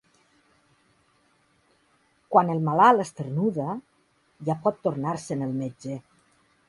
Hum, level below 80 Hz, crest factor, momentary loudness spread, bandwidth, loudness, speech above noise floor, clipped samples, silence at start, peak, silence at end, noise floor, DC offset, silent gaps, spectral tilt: none; -68 dBFS; 22 dB; 17 LU; 11.5 kHz; -25 LUFS; 42 dB; under 0.1%; 2.3 s; -4 dBFS; 0.7 s; -66 dBFS; under 0.1%; none; -7 dB/octave